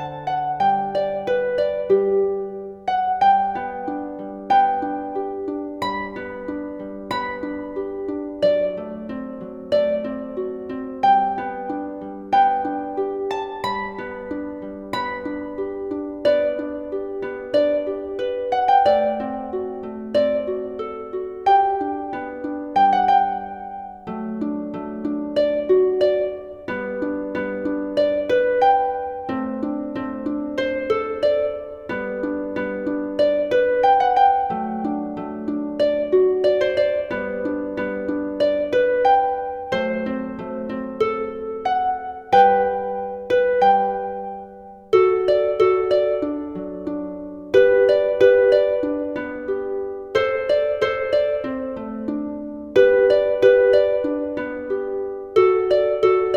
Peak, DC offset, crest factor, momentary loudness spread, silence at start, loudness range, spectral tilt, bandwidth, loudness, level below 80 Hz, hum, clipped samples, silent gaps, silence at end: -2 dBFS; under 0.1%; 18 dB; 13 LU; 0 s; 6 LU; -6.5 dB/octave; 7.4 kHz; -21 LUFS; -54 dBFS; none; under 0.1%; none; 0 s